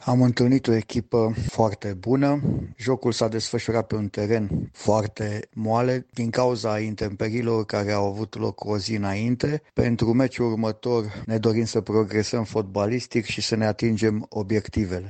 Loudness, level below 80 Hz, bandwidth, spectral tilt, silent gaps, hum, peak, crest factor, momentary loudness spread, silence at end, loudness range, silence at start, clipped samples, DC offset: -24 LUFS; -48 dBFS; 9 kHz; -6.5 dB/octave; none; none; -6 dBFS; 18 dB; 6 LU; 0 s; 2 LU; 0 s; under 0.1%; under 0.1%